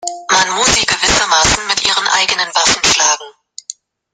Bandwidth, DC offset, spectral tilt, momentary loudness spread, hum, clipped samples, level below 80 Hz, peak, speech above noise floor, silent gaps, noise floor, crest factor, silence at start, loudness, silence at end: 16 kHz; under 0.1%; 0 dB/octave; 14 LU; none; under 0.1%; -36 dBFS; 0 dBFS; 22 dB; none; -35 dBFS; 14 dB; 0 s; -11 LUFS; 0.4 s